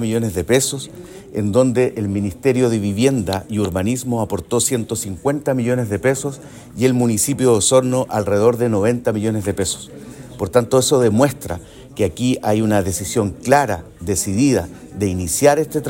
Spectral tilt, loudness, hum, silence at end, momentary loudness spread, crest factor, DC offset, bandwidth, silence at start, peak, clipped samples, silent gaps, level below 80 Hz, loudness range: -5 dB/octave; -18 LUFS; none; 0 s; 13 LU; 18 dB; under 0.1%; 16.5 kHz; 0 s; 0 dBFS; under 0.1%; none; -48 dBFS; 3 LU